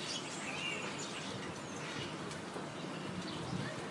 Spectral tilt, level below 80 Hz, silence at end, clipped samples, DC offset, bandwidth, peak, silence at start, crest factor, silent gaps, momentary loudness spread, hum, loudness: -3.5 dB/octave; -72 dBFS; 0 s; under 0.1%; under 0.1%; 12 kHz; -26 dBFS; 0 s; 16 dB; none; 5 LU; none; -41 LUFS